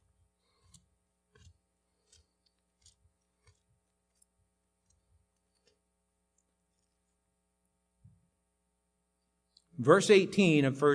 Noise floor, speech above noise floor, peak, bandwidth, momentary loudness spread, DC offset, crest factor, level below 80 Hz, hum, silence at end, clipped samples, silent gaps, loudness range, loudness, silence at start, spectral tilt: -80 dBFS; 55 dB; -8 dBFS; 10.5 kHz; 4 LU; under 0.1%; 26 dB; -76 dBFS; none; 0 s; under 0.1%; none; 5 LU; -25 LUFS; 9.8 s; -5.5 dB/octave